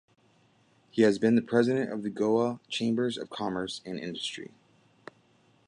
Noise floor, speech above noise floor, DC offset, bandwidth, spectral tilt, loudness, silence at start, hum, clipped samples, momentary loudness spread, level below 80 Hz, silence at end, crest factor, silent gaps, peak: -65 dBFS; 37 dB; under 0.1%; 10.5 kHz; -5.5 dB/octave; -29 LUFS; 0.95 s; none; under 0.1%; 12 LU; -70 dBFS; 1.2 s; 20 dB; none; -10 dBFS